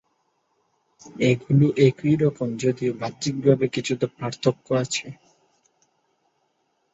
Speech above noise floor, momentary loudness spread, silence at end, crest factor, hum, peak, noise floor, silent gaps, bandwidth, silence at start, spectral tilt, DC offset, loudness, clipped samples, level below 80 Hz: 49 dB; 9 LU; 1.8 s; 20 dB; none; -4 dBFS; -71 dBFS; none; 8 kHz; 1.05 s; -6.5 dB/octave; under 0.1%; -23 LUFS; under 0.1%; -60 dBFS